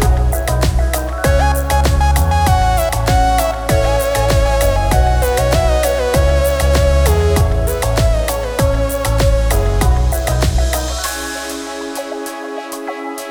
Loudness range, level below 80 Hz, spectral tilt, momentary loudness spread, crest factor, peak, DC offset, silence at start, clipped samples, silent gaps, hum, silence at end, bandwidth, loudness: 4 LU; -16 dBFS; -5 dB/octave; 10 LU; 14 dB; 0 dBFS; under 0.1%; 0 s; under 0.1%; none; none; 0 s; over 20 kHz; -15 LUFS